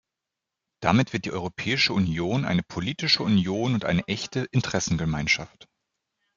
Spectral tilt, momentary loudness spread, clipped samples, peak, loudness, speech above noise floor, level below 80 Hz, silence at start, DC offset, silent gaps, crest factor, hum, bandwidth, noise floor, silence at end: -5 dB/octave; 7 LU; under 0.1%; -4 dBFS; -25 LUFS; 61 dB; -52 dBFS; 0.8 s; under 0.1%; none; 22 dB; none; 7.6 kHz; -86 dBFS; 0.9 s